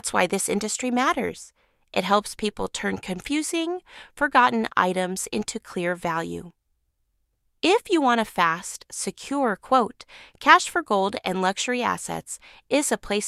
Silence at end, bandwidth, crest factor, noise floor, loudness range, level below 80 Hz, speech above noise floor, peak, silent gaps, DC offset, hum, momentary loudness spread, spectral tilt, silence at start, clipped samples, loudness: 0 s; 15.5 kHz; 24 dB; -72 dBFS; 4 LU; -56 dBFS; 48 dB; -2 dBFS; none; under 0.1%; none; 12 LU; -3 dB/octave; 0.05 s; under 0.1%; -24 LUFS